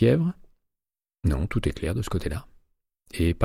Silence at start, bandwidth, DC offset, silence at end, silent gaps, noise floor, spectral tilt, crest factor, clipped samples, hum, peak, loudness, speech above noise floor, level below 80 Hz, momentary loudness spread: 0 s; 14.5 kHz; under 0.1%; 0 s; none; under -90 dBFS; -7.5 dB/octave; 18 dB; under 0.1%; none; -8 dBFS; -28 LUFS; over 66 dB; -36 dBFS; 12 LU